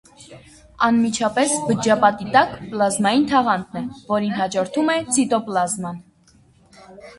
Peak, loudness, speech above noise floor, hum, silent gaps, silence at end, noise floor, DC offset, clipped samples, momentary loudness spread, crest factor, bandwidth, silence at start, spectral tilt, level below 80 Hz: 0 dBFS; -19 LUFS; 35 dB; none; none; 0.05 s; -54 dBFS; under 0.1%; under 0.1%; 7 LU; 20 dB; 12 kHz; 0.2 s; -4 dB/octave; -56 dBFS